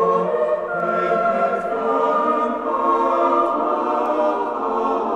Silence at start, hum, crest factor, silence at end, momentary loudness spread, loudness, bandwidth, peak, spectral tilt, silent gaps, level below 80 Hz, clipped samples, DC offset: 0 s; none; 14 dB; 0 s; 4 LU; -20 LUFS; 9.4 kHz; -6 dBFS; -7 dB/octave; none; -56 dBFS; under 0.1%; under 0.1%